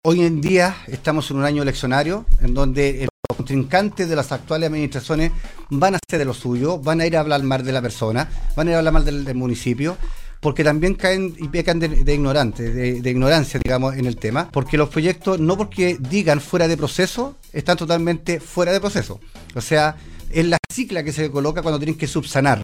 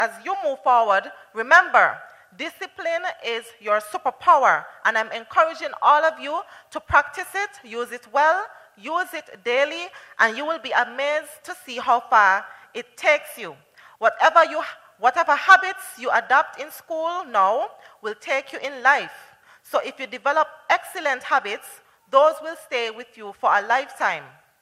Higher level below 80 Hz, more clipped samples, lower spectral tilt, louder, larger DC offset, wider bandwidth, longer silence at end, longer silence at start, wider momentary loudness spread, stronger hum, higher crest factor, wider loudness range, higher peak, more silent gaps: first, -26 dBFS vs -62 dBFS; neither; first, -6 dB/octave vs -2 dB/octave; about the same, -20 LUFS vs -21 LUFS; neither; about the same, 15 kHz vs 15.5 kHz; second, 0 s vs 0.35 s; about the same, 0.05 s vs 0 s; second, 7 LU vs 17 LU; neither; second, 16 dB vs 22 dB; second, 2 LU vs 5 LU; about the same, -4 dBFS vs -2 dBFS; first, 3.10-3.23 s, 20.59-20.63 s vs none